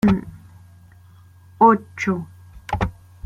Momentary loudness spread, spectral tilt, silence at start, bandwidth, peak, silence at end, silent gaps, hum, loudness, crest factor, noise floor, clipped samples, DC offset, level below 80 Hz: 24 LU; -7.5 dB/octave; 0.05 s; 10 kHz; -2 dBFS; 0.35 s; none; none; -20 LUFS; 20 dB; -48 dBFS; under 0.1%; under 0.1%; -40 dBFS